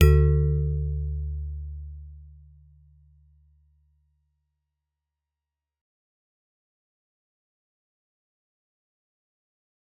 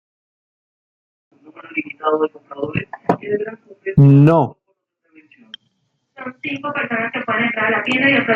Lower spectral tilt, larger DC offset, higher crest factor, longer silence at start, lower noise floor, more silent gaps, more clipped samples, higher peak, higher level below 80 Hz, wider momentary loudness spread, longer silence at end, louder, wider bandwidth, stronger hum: about the same, -8.5 dB/octave vs -8.5 dB/octave; neither; first, 26 dB vs 18 dB; second, 0 s vs 1.55 s; first, -89 dBFS vs -68 dBFS; neither; neither; about the same, -4 dBFS vs -2 dBFS; first, -34 dBFS vs -54 dBFS; first, 24 LU vs 17 LU; first, 7.7 s vs 0 s; second, -26 LUFS vs -17 LUFS; second, 4 kHz vs 4.6 kHz; neither